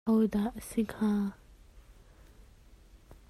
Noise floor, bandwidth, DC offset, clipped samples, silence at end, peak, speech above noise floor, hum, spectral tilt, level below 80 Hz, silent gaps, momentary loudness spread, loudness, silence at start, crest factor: -57 dBFS; 14.5 kHz; under 0.1%; under 0.1%; 0.15 s; -18 dBFS; 27 dB; none; -7 dB/octave; -56 dBFS; none; 7 LU; -31 LUFS; 0.05 s; 16 dB